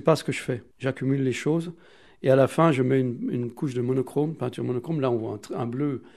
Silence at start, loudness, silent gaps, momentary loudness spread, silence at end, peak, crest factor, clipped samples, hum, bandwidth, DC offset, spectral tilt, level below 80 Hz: 0 s; -26 LUFS; none; 10 LU; 0.1 s; -4 dBFS; 20 dB; under 0.1%; none; 13.5 kHz; 0.1%; -7 dB/octave; -66 dBFS